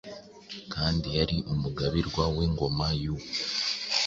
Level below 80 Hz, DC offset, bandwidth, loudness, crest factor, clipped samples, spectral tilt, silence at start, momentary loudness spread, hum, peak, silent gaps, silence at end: -40 dBFS; under 0.1%; 7.8 kHz; -29 LUFS; 20 dB; under 0.1%; -5 dB/octave; 0.05 s; 12 LU; none; -10 dBFS; none; 0 s